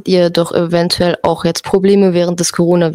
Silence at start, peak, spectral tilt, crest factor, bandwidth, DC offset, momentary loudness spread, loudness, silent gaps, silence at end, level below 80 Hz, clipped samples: 0.05 s; 0 dBFS; -5.5 dB/octave; 12 dB; 15.5 kHz; under 0.1%; 4 LU; -13 LUFS; none; 0 s; -44 dBFS; under 0.1%